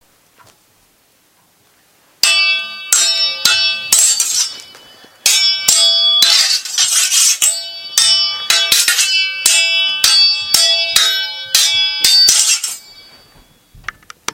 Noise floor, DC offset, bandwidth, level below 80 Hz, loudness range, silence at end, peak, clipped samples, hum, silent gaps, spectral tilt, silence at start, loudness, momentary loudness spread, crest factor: -54 dBFS; under 0.1%; over 20 kHz; -56 dBFS; 3 LU; 0.55 s; 0 dBFS; 0.1%; none; none; 3.5 dB/octave; 2.25 s; -10 LUFS; 10 LU; 14 dB